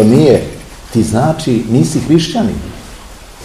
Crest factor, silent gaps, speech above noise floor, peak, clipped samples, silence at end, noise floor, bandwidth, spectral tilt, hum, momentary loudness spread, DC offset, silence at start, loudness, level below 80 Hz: 12 dB; none; 22 dB; 0 dBFS; 0.5%; 0 s; -32 dBFS; 15.5 kHz; -6.5 dB/octave; none; 21 LU; 0.3%; 0 s; -12 LUFS; -34 dBFS